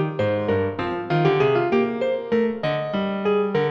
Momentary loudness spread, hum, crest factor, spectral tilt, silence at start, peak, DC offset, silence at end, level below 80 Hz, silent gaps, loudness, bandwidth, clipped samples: 6 LU; none; 14 dB; -8 dB/octave; 0 s; -8 dBFS; under 0.1%; 0 s; -58 dBFS; none; -22 LUFS; 7.2 kHz; under 0.1%